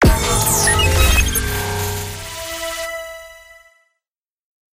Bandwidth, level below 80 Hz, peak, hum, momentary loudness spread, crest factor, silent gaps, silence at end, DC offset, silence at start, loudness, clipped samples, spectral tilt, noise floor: 16 kHz; -24 dBFS; -2 dBFS; none; 14 LU; 18 dB; none; 1.35 s; under 0.1%; 0 s; -17 LUFS; under 0.1%; -3 dB/octave; -86 dBFS